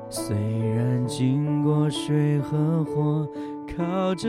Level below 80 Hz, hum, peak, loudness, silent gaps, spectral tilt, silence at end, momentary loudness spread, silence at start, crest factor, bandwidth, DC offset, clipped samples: -52 dBFS; none; -10 dBFS; -25 LUFS; none; -7 dB/octave; 0 s; 6 LU; 0 s; 14 dB; 14 kHz; under 0.1%; under 0.1%